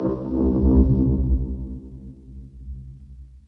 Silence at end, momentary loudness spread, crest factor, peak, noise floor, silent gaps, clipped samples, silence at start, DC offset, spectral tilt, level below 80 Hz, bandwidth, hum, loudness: 0.2 s; 24 LU; 16 dB; -6 dBFS; -43 dBFS; none; under 0.1%; 0 s; under 0.1%; -13.5 dB/octave; -26 dBFS; 1.7 kHz; none; -21 LUFS